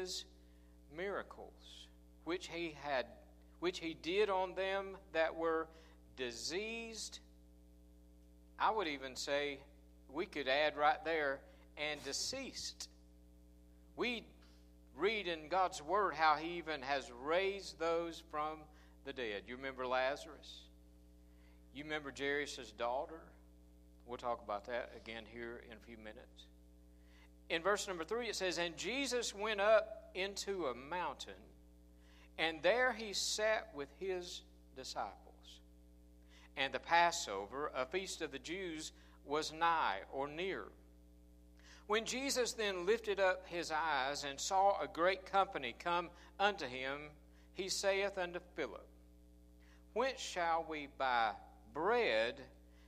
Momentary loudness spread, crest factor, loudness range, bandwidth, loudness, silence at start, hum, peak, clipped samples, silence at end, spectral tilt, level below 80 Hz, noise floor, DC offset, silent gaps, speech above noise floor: 18 LU; 24 dB; 7 LU; 15 kHz; -39 LUFS; 0 s; 60 Hz at -65 dBFS; -18 dBFS; under 0.1%; 0 s; -2.5 dB/octave; -64 dBFS; -62 dBFS; under 0.1%; none; 23 dB